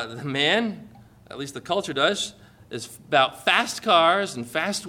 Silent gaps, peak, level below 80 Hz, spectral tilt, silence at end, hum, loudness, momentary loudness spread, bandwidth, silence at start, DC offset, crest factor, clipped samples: none; -4 dBFS; -64 dBFS; -3 dB/octave; 0 s; none; -22 LUFS; 17 LU; 17 kHz; 0 s; under 0.1%; 20 dB; under 0.1%